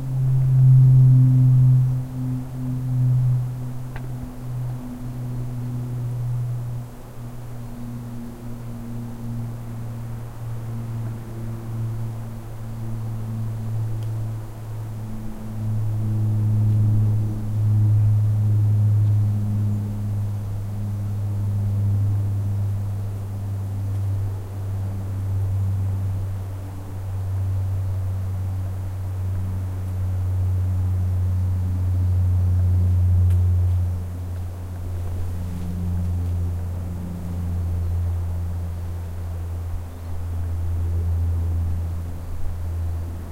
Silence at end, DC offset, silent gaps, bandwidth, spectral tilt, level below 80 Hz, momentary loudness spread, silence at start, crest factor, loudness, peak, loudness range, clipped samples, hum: 0 s; under 0.1%; none; 15 kHz; -9 dB/octave; -36 dBFS; 14 LU; 0 s; 16 dB; -24 LUFS; -6 dBFS; 11 LU; under 0.1%; none